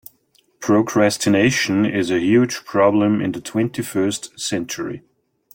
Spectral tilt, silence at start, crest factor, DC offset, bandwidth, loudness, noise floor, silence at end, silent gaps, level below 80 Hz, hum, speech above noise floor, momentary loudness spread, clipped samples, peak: -5 dB/octave; 0.6 s; 16 dB; under 0.1%; 17 kHz; -19 LUFS; -60 dBFS; 0.55 s; none; -58 dBFS; none; 42 dB; 10 LU; under 0.1%; -4 dBFS